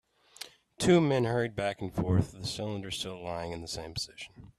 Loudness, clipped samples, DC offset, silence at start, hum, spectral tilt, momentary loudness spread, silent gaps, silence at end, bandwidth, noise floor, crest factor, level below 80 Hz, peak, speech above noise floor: -31 LUFS; under 0.1%; under 0.1%; 0.4 s; none; -5.5 dB/octave; 21 LU; none; 0.1 s; 14 kHz; -50 dBFS; 20 dB; -56 dBFS; -12 dBFS; 19 dB